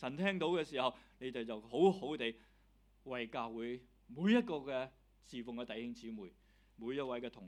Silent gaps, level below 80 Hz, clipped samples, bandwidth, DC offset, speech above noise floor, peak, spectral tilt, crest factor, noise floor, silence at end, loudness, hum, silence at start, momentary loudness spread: none; -70 dBFS; under 0.1%; 11 kHz; under 0.1%; 31 dB; -18 dBFS; -6.5 dB/octave; 22 dB; -69 dBFS; 0 s; -39 LUFS; none; 0 s; 17 LU